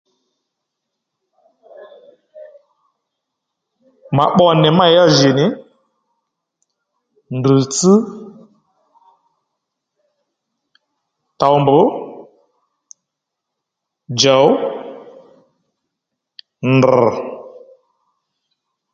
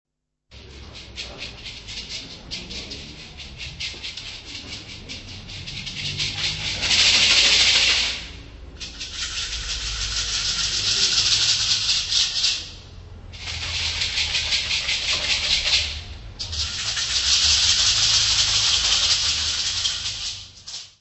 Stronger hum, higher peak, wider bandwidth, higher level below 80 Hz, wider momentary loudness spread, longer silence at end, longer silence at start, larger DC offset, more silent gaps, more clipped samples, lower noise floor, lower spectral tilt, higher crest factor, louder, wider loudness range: neither; first, 0 dBFS vs -4 dBFS; first, 9.4 kHz vs 8.4 kHz; second, -58 dBFS vs -40 dBFS; about the same, 19 LU vs 20 LU; first, 1.45 s vs 0.1 s; first, 1.8 s vs 0.5 s; neither; neither; neither; first, -79 dBFS vs -55 dBFS; first, -5 dB/octave vs 0.5 dB/octave; about the same, 18 dB vs 20 dB; first, -13 LUFS vs -19 LUFS; second, 5 LU vs 15 LU